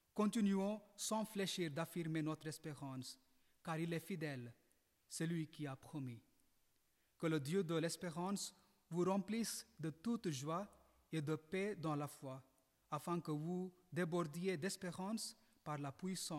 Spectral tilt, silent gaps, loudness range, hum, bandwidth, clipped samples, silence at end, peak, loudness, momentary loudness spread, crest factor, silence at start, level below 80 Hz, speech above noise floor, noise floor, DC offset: -5 dB/octave; none; 5 LU; none; 16 kHz; under 0.1%; 0 s; -28 dBFS; -44 LUFS; 10 LU; 16 dB; 0.15 s; -82 dBFS; 36 dB; -80 dBFS; under 0.1%